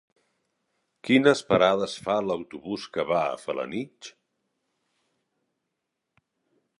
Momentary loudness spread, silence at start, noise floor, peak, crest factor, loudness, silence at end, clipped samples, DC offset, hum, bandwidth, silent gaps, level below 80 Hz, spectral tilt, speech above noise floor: 18 LU; 1.05 s; -82 dBFS; -6 dBFS; 22 dB; -25 LUFS; 2.7 s; under 0.1%; under 0.1%; none; 11.5 kHz; none; -64 dBFS; -5 dB/octave; 57 dB